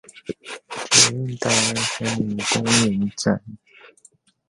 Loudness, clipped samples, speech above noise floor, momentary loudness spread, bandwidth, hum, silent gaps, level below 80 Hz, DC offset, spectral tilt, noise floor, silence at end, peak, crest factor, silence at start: -19 LUFS; under 0.1%; 34 dB; 19 LU; 11.5 kHz; none; none; -54 dBFS; under 0.1%; -2.5 dB/octave; -56 dBFS; 0.6 s; 0 dBFS; 22 dB; 0.15 s